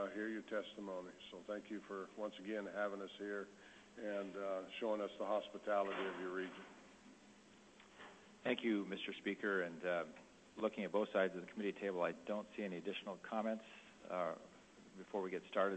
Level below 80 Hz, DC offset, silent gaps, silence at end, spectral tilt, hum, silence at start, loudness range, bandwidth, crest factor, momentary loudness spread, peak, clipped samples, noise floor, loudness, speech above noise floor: -84 dBFS; under 0.1%; none; 0 s; -5.5 dB/octave; none; 0 s; 5 LU; 8.2 kHz; 20 dB; 20 LU; -22 dBFS; under 0.1%; -64 dBFS; -43 LUFS; 22 dB